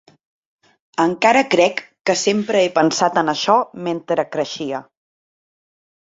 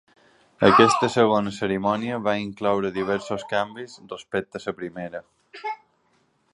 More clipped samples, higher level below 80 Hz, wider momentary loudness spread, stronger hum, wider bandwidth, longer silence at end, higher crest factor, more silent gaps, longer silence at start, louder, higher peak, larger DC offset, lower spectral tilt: neither; second, -64 dBFS vs -58 dBFS; second, 11 LU vs 19 LU; neither; second, 8 kHz vs 11.5 kHz; first, 1.2 s vs 0.8 s; about the same, 20 dB vs 24 dB; first, 2.01-2.05 s vs none; first, 1 s vs 0.6 s; first, -18 LUFS vs -23 LUFS; about the same, 0 dBFS vs -2 dBFS; neither; second, -3.5 dB/octave vs -5 dB/octave